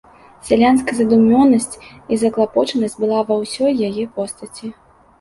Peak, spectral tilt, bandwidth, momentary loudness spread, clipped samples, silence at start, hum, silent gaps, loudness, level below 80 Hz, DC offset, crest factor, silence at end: -2 dBFS; -5 dB/octave; 11.5 kHz; 18 LU; under 0.1%; 0.45 s; none; none; -16 LUFS; -50 dBFS; under 0.1%; 14 dB; 0.5 s